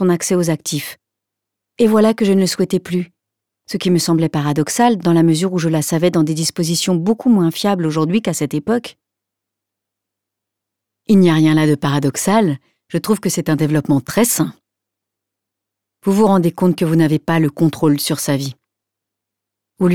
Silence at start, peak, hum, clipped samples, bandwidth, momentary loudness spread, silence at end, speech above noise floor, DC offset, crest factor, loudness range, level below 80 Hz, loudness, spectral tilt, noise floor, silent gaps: 0 s; -4 dBFS; none; under 0.1%; 18.5 kHz; 9 LU; 0 s; 67 dB; under 0.1%; 14 dB; 4 LU; -56 dBFS; -16 LUFS; -5.5 dB/octave; -82 dBFS; none